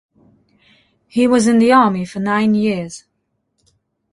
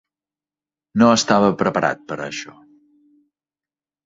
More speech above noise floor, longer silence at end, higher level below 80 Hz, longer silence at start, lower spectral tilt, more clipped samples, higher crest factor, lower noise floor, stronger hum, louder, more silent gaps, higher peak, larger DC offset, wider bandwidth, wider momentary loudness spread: second, 56 dB vs over 72 dB; second, 1.15 s vs 1.55 s; about the same, -58 dBFS vs -60 dBFS; first, 1.15 s vs 0.95 s; about the same, -5.5 dB/octave vs -4.5 dB/octave; neither; about the same, 16 dB vs 20 dB; second, -70 dBFS vs under -90 dBFS; neither; first, -15 LUFS vs -18 LUFS; neither; about the same, -2 dBFS vs -2 dBFS; neither; first, 11.5 kHz vs 7.8 kHz; about the same, 13 LU vs 15 LU